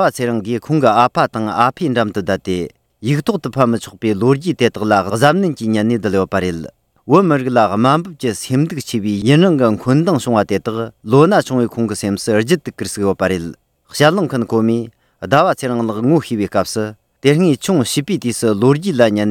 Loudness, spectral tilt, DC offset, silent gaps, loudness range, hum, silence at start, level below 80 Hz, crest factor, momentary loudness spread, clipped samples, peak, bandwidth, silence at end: -15 LUFS; -6 dB/octave; under 0.1%; none; 3 LU; none; 0 s; -52 dBFS; 16 dB; 9 LU; under 0.1%; 0 dBFS; 17 kHz; 0 s